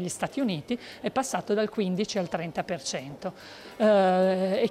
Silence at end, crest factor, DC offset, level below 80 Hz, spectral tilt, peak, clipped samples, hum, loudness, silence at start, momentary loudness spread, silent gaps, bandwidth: 0 s; 14 dB; under 0.1%; -66 dBFS; -5 dB/octave; -12 dBFS; under 0.1%; none; -27 LUFS; 0 s; 15 LU; none; 15 kHz